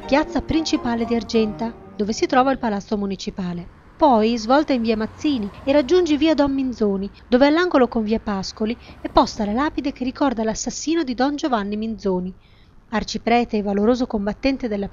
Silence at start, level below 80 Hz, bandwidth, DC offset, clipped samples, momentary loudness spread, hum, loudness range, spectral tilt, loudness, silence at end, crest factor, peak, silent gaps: 0 s; -42 dBFS; 7.6 kHz; under 0.1%; under 0.1%; 10 LU; none; 4 LU; -5 dB/octave; -21 LUFS; 0.05 s; 20 dB; 0 dBFS; none